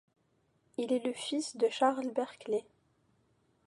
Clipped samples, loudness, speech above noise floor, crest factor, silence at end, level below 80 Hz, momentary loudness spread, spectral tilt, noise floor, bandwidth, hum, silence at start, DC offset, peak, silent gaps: under 0.1%; -33 LUFS; 41 dB; 20 dB; 1.05 s; -84 dBFS; 8 LU; -3 dB/octave; -74 dBFS; 11.5 kHz; none; 0.8 s; under 0.1%; -16 dBFS; none